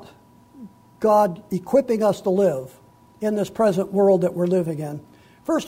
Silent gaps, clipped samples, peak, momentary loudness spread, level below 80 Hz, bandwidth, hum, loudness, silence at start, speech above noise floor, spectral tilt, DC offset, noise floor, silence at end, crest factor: none; under 0.1%; -6 dBFS; 13 LU; -60 dBFS; 16 kHz; none; -21 LUFS; 0 s; 30 dB; -7 dB/octave; under 0.1%; -50 dBFS; 0 s; 16 dB